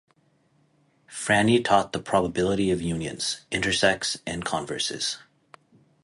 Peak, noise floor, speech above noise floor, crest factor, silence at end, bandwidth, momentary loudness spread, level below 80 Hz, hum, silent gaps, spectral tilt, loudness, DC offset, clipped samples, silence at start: -4 dBFS; -65 dBFS; 40 dB; 22 dB; 0.85 s; 11.5 kHz; 10 LU; -52 dBFS; none; none; -4 dB/octave; -24 LUFS; under 0.1%; under 0.1%; 1.1 s